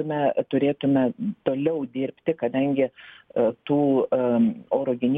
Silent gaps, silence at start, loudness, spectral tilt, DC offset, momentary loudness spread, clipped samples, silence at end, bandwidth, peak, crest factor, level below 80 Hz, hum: none; 0 s; -24 LUFS; -10 dB/octave; under 0.1%; 6 LU; under 0.1%; 0 s; 3.8 kHz; -8 dBFS; 14 dB; -66 dBFS; none